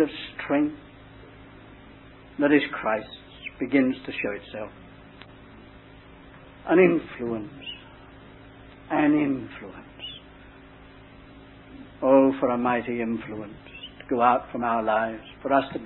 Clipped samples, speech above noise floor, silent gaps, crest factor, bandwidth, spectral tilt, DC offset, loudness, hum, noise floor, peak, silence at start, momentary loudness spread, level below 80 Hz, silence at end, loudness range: under 0.1%; 24 dB; none; 22 dB; 4.2 kHz; -10 dB/octave; under 0.1%; -24 LUFS; none; -48 dBFS; -6 dBFS; 0 s; 22 LU; -56 dBFS; 0 s; 5 LU